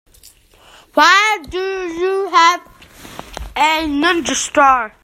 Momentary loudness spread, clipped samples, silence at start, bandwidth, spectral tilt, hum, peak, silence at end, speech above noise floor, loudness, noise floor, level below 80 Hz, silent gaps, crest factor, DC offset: 17 LU; under 0.1%; 0.95 s; 16 kHz; -1.5 dB/octave; none; 0 dBFS; 0.15 s; 33 dB; -14 LUFS; -47 dBFS; -42 dBFS; none; 16 dB; under 0.1%